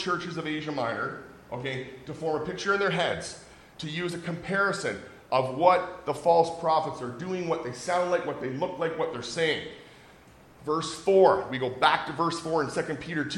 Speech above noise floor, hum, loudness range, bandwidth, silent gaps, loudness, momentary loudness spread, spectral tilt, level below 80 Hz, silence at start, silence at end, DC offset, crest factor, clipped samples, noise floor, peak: 26 dB; none; 5 LU; 16.5 kHz; none; -28 LUFS; 13 LU; -4.5 dB/octave; -62 dBFS; 0 s; 0 s; under 0.1%; 22 dB; under 0.1%; -53 dBFS; -6 dBFS